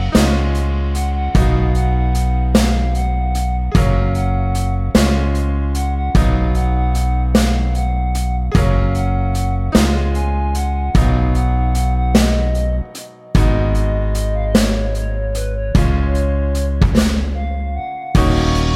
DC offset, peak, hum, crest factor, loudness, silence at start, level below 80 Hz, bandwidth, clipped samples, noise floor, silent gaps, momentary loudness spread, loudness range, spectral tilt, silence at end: under 0.1%; 0 dBFS; none; 14 dB; -17 LUFS; 0 s; -18 dBFS; 14 kHz; under 0.1%; -35 dBFS; none; 5 LU; 1 LU; -6.5 dB/octave; 0 s